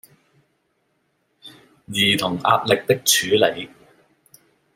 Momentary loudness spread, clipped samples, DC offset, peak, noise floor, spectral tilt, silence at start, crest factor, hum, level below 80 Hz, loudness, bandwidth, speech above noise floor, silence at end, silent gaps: 12 LU; under 0.1%; under 0.1%; -2 dBFS; -69 dBFS; -2.5 dB/octave; 1.45 s; 20 dB; none; -64 dBFS; -18 LUFS; 16.5 kHz; 50 dB; 1.1 s; none